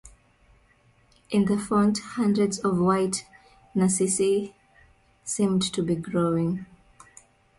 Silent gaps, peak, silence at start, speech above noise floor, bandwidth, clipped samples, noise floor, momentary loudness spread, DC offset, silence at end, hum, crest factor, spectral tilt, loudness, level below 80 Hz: none; -12 dBFS; 0.05 s; 37 dB; 11.5 kHz; under 0.1%; -61 dBFS; 10 LU; under 0.1%; 0.95 s; none; 16 dB; -5.5 dB/octave; -25 LUFS; -58 dBFS